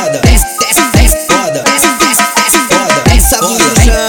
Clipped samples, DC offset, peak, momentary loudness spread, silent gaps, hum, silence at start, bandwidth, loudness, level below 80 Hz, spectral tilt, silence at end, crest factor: 0.3%; under 0.1%; 0 dBFS; 2 LU; none; none; 0 s; 19 kHz; -8 LUFS; -14 dBFS; -3 dB/octave; 0 s; 8 dB